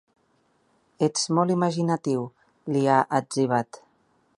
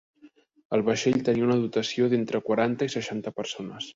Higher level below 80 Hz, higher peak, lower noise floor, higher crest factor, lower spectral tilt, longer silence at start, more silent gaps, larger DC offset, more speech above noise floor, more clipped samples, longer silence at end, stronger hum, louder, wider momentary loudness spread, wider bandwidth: second, -72 dBFS vs -64 dBFS; first, -6 dBFS vs -10 dBFS; first, -67 dBFS vs -56 dBFS; about the same, 20 dB vs 16 dB; about the same, -5.5 dB/octave vs -5.5 dB/octave; first, 1 s vs 0.25 s; second, none vs 0.65-0.70 s; neither; first, 43 dB vs 31 dB; neither; first, 0.6 s vs 0.05 s; neither; about the same, -24 LUFS vs -26 LUFS; about the same, 9 LU vs 9 LU; first, 11.5 kHz vs 7.8 kHz